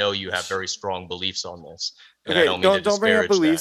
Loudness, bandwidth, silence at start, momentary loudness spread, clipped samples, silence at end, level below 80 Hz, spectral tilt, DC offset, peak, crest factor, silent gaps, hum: -22 LUFS; 14 kHz; 0 s; 13 LU; under 0.1%; 0 s; -60 dBFS; -3.5 dB/octave; under 0.1%; -2 dBFS; 20 dB; none; none